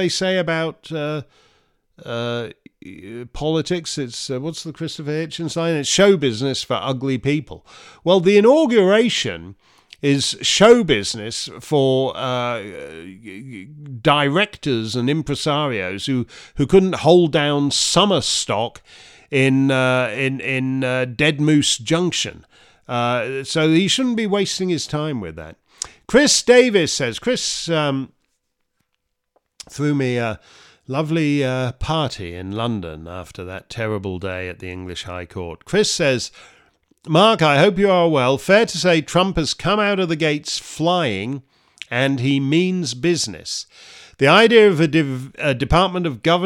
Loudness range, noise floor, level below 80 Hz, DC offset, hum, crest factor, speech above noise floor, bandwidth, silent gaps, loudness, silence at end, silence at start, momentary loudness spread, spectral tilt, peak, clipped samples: 9 LU; -74 dBFS; -46 dBFS; under 0.1%; none; 18 dB; 56 dB; 16 kHz; none; -18 LUFS; 0 s; 0 s; 16 LU; -4.5 dB/octave; 0 dBFS; under 0.1%